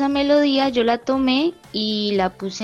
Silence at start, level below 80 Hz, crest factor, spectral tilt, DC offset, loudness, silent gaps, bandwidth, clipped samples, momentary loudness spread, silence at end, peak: 0 s; -50 dBFS; 14 dB; -5 dB/octave; under 0.1%; -19 LUFS; none; 9 kHz; under 0.1%; 7 LU; 0 s; -6 dBFS